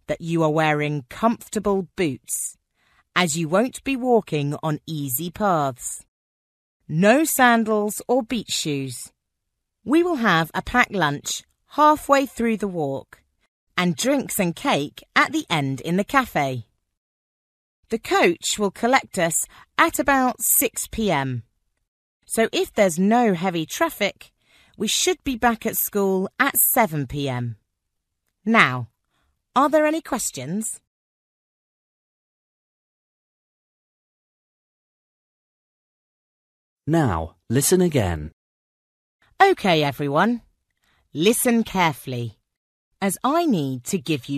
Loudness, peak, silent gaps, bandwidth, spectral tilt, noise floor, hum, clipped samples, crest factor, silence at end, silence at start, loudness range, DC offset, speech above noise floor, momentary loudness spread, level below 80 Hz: -21 LUFS; 0 dBFS; 6.08-6.80 s, 13.48-13.67 s, 16.97-17.83 s, 21.88-22.20 s, 30.87-36.77 s, 38.33-39.19 s, 42.57-42.91 s; 14 kHz; -4 dB/octave; -79 dBFS; none; under 0.1%; 22 dB; 0 s; 0.1 s; 3 LU; under 0.1%; 58 dB; 11 LU; -52 dBFS